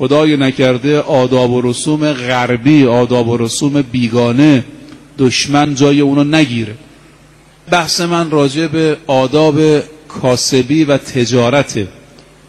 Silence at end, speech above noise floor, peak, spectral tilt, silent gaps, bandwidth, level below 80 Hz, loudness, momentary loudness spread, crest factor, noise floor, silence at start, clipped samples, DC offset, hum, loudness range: 0.55 s; 32 dB; 0 dBFS; -5.5 dB/octave; none; 12.5 kHz; -46 dBFS; -12 LUFS; 6 LU; 12 dB; -43 dBFS; 0 s; under 0.1%; under 0.1%; none; 2 LU